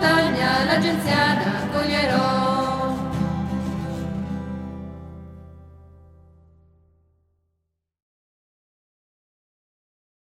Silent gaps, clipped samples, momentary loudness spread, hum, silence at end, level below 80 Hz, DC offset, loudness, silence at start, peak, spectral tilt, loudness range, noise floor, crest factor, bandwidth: none; under 0.1%; 17 LU; none; 4.4 s; -46 dBFS; under 0.1%; -22 LUFS; 0 s; -6 dBFS; -5.5 dB/octave; 19 LU; -77 dBFS; 18 dB; 16 kHz